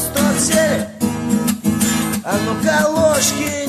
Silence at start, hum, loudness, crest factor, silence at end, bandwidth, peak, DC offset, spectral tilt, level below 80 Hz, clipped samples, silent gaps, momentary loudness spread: 0 s; none; -16 LUFS; 14 dB; 0 s; 14 kHz; -4 dBFS; under 0.1%; -4 dB/octave; -42 dBFS; under 0.1%; none; 5 LU